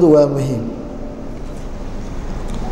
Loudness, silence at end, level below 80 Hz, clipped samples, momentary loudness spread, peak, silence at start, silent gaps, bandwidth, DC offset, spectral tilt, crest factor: -21 LUFS; 0 s; -28 dBFS; under 0.1%; 17 LU; -2 dBFS; 0 s; none; 13 kHz; under 0.1%; -8 dB/octave; 16 dB